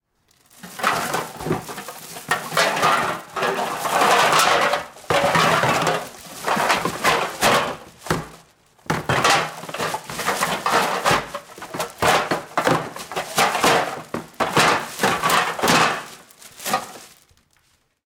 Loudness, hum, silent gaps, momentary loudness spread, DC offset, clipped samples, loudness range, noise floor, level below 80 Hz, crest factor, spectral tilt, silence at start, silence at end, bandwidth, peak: -20 LUFS; none; none; 14 LU; under 0.1%; under 0.1%; 4 LU; -63 dBFS; -54 dBFS; 18 dB; -2.5 dB/octave; 0.65 s; 1 s; 18 kHz; -4 dBFS